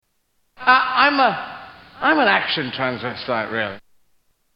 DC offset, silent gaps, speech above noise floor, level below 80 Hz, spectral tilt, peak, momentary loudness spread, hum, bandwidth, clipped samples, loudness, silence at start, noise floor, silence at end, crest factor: under 0.1%; none; 48 dB; -60 dBFS; -6.5 dB/octave; 0 dBFS; 14 LU; none; 5.8 kHz; under 0.1%; -19 LUFS; 0.6 s; -67 dBFS; 0.75 s; 20 dB